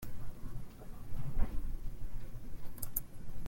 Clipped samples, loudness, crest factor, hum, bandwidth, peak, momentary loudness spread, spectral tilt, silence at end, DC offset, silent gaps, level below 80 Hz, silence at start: under 0.1%; -46 LUFS; 18 dB; none; 17 kHz; -16 dBFS; 11 LU; -5.5 dB/octave; 0 s; under 0.1%; none; -40 dBFS; 0 s